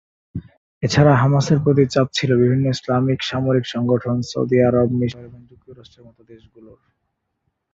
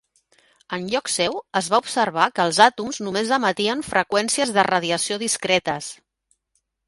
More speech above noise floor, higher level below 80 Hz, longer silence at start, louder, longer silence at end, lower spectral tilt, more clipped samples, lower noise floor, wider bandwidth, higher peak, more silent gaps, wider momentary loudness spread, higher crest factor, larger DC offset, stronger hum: first, 56 dB vs 51 dB; first, -48 dBFS vs -62 dBFS; second, 0.35 s vs 0.7 s; first, -18 LUFS vs -21 LUFS; first, 1.4 s vs 0.95 s; first, -7 dB/octave vs -2.5 dB/octave; neither; about the same, -74 dBFS vs -72 dBFS; second, 7.8 kHz vs 12 kHz; about the same, -2 dBFS vs 0 dBFS; first, 0.57-0.81 s vs none; about the same, 12 LU vs 10 LU; second, 16 dB vs 22 dB; neither; neither